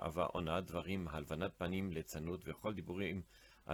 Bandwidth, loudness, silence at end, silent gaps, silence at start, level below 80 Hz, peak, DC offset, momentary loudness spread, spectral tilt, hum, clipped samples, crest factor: over 20 kHz; -42 LUFS; 0 s; none; 0 s; -62 dBFS; -24 dBFS; under 0.1%; 6 LU; -6 dB/octave; none; under 0.1%; 18 dB